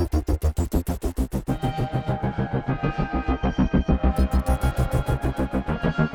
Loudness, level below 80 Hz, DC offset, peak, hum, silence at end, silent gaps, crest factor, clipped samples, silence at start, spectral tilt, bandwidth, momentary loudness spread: -25 LUFS; -28 dBFS; under 0.1%; -8 dBFS; none; 0 s; none; 14 dB; under 0.1%; 0 s; -7.5 dB/octave; 18 kHz; 5 LU